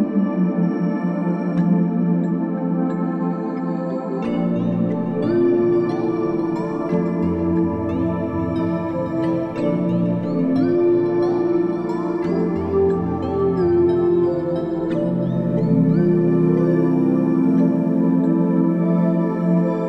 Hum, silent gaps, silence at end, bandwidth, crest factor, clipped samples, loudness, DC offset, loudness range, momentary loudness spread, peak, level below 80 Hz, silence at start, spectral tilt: none; none; 0 s; 5.8 kHz; 12 dB; under 0.1%; -20 LUFS; under 0.1%; 4 LU; 6 LU; -6 dBFS; -54 dBFS; 0 s; -10.5 dB/octave